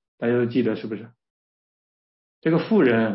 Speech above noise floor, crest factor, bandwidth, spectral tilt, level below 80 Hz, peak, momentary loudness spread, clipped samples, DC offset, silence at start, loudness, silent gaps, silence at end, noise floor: over 69 dB; 16 dB; 5.8 kHz; -11.5 dB/octave; -70 dBFS; -8 dBFS; 13 LU; under 0.1%; under 0.1%; 0.2 s; -22 LUFS; 1.30-2.42 s; 0 s; under -90 dBFS